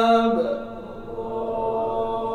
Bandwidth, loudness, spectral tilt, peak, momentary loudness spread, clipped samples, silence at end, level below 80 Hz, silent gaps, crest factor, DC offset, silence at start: 10 kHz; -24 LUFS; -6.5 dB/octave; -8 dBFS; 16 LU; under 0.1%; 0 s; -48 dBFS; none; 16 dB; under 0.1%; 0 s